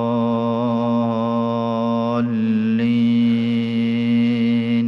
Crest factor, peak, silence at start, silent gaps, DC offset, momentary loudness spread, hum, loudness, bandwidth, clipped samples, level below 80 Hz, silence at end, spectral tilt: 8 dB; -10 dBFS; 0 s; none; under 0.1%; 3 LU; none; -19 LUFS; 5.8 kHz; under 0.1%; -66 dBFS; 0 s; -9 dB/octave